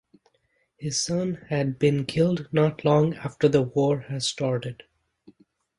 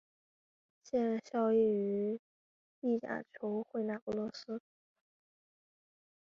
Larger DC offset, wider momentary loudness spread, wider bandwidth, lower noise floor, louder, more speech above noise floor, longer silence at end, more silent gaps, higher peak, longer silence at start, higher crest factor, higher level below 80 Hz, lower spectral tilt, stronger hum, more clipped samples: neither; second, 7 LU vs 13 LU; first, 11.5 kHz vs 7.2 kHz; second, -70 dBFS vs under -90 dBFS; first, -24 LUFS vs -36 LUFS; second, 46 dB vs over 55 dB; second, 1.05 s vs 1.7 s; second, none vs 2.19-2.82 s, 4.02-4.07 s; first, -6 dBFS vs -22 dBFS; about the same, 0.8 s vs 0.85 s; about the same, 18 dB vs 16 dB; first, -60 dBFS vs -78 dBFS; about the same, -5.5 dB/octave vs -6 dB/octave; neither; neither